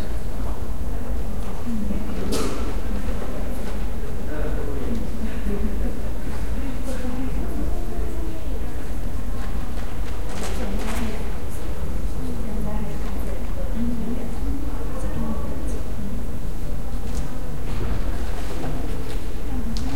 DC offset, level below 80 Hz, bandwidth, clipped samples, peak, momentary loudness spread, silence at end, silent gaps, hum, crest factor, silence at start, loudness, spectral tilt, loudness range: 10%; -28 dBFS; 16.5 kHz; under 0.1%; -6 dBFS; 4 LU; 0 s; none; none; 16 dB; 0 s; -30 LUFS; -6.5 dB/octave; 2 LU